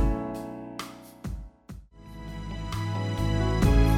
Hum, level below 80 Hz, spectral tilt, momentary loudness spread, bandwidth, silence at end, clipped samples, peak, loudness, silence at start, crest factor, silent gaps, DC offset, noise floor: none; -30 dBFS; -7 dB/octave; 22 LU; 15.5 kHz; 0 s; under 0.1%; -10 dBFS; -30 LUFS; 0 s; 16 dB; none; under 0.1%; -46 dBFS